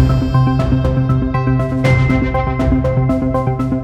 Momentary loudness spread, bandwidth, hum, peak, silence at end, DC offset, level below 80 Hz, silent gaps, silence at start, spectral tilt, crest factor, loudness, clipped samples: 3 LU; 7.6 kHz; none; -2 dBFS; 0 s; under 0.1%; -24 dBFS; none; 0 s; -8.5 dB/octave; 12 dB; -15 LUFS; under 0.1%